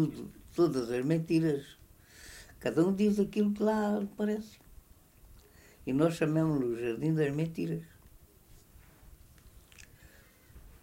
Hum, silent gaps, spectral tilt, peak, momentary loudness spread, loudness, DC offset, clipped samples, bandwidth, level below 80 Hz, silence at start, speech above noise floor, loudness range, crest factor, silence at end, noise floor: none; none; -7.5 dB/octave; -16 dBFS; 17 LU; -31 LUFS; under 0.1%; under 0.1%; 16 kHz; -60 dBFS; 0 s; 29 dB; 6 LU; 18 dB; 0.15 s; -59 dBFS